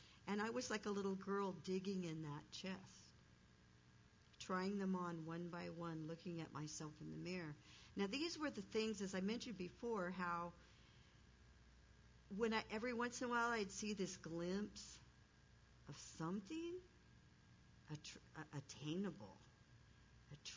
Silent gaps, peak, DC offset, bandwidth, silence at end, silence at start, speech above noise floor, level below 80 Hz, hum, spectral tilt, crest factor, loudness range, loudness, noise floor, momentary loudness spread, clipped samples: none; -28 dBFS; under 0.1%; 7.6 kHz; 0 s; 0 s; 23 dB; -74 dBFS; none; -5 dB/octave; 20 dB; 8 LU; -47 LUFS; -70 dBFS; 16 LU; under 0.1%